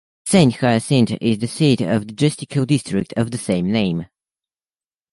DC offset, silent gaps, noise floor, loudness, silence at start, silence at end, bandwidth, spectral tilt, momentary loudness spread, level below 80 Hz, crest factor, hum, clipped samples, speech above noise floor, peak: under 0.1%; none; under -90 dBFS; -18 LUFS; 0.25 s; 1.1 s; 11.5 kHz; -6 dB/octave; 8 LU; -50 dBFS; 18 dB; none; under 0.1%; over 72 dB; -2 dBFS